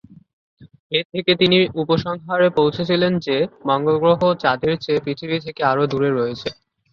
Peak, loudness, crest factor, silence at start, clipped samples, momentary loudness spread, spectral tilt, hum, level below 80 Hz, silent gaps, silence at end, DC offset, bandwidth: -2 dBFS; -19 LUFS; 18 dB; 0.6 s; under 0.1%; 8 LU; -7 dB/octave; none; -54 dBFS; 0.79-0.90 s, 1.05-1.10 s; 0.4 s; under 0.1%; 6.8 kHz